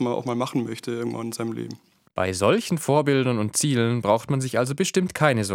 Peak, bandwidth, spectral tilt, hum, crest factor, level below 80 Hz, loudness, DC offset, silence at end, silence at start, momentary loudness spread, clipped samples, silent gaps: -2 dBFS; 17 kHz; -5 dB/octave; none; 22 dB; -64 dBFS; -23 LUFS; under 0.1%; 0 s; 0 s; 9 LU; under 0.1%; none